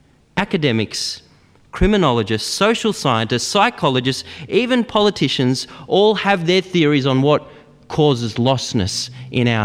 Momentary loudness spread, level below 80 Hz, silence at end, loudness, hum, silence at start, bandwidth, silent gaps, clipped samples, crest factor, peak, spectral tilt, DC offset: 8 LU; -38 dBFS; 0 s; -17 LUFS; none; 0.35 s; 14.5 kHz; none; under 0.1%; 16 dB; -2 dBFS; -5 dB/octave; under 0.1%